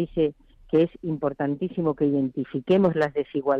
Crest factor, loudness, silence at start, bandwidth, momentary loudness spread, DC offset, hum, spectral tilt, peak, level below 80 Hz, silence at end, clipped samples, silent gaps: 14 dB; -25 LUFS; 0 s; 7.4 kHz; 7 LU; under 0.1%; none; -9 dB/octave; -10 dBFS; -54 dBFS; 0 s; under 0.1%; none